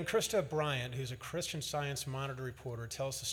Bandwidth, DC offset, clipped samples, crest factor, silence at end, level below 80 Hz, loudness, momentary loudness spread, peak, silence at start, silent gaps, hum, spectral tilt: 19 kHz; under 0.1%; under 0.1%; 18 dB; 0 s; -62 dBFS; -37 LUFS; 9 LU; -20 dBFS; 0 s; none; none; -4 dB/octave